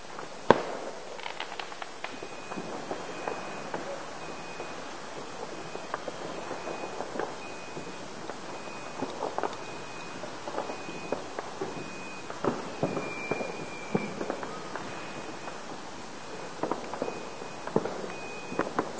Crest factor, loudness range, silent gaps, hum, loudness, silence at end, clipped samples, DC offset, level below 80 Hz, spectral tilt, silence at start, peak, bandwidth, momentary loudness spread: 34 dB; 4 LU; none; none; -36 LUFS; 0 s; under 0.1%; 0.6%; -66 dBFS; -4.5 dB/octave; 0 s; -2 dBFS; 8 kHz; 8 LU